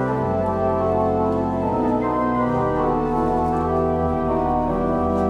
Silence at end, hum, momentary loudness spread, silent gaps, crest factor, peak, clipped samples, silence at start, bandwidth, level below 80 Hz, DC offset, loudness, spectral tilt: 0 s; none; 1 LU; none; 12 dB; -8 dBFS; under 0.1%; 0 s; 9.6 kHz; -36 dBFS; under 0.1%; -21 LUFS; -9.5 dB/octave